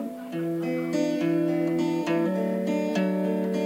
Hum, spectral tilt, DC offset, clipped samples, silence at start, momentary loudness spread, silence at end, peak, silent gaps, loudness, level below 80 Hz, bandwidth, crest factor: none; -7 dB/octave; under 0.1%; under 0.1%; 0 s; 4 LU; 0 s; -14 dBFS; none; -26 LUFS; -80 dBFS; 16 kHz; 12 dB